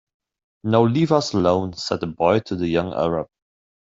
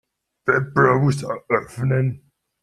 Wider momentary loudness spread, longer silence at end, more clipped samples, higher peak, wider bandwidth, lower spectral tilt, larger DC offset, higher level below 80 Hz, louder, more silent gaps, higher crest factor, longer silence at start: about the same, 8 LU vs 10 LU; about the same, 0.55 s vs 0.45 s; neither; about the same, -2 dBFS vs -2 dBFS; second, 7.8 kHz vs 12 kHz; about the same, -6.5 dB/octave vs -7.5 dB/octave; neither; about the same, -56 dBFS vs -56 dBFS; about the same, -21 LUFS vs -20 LUFS; neither; about the same, 18 dB vs 18 dB; first, 0.65 s vs 0.45 s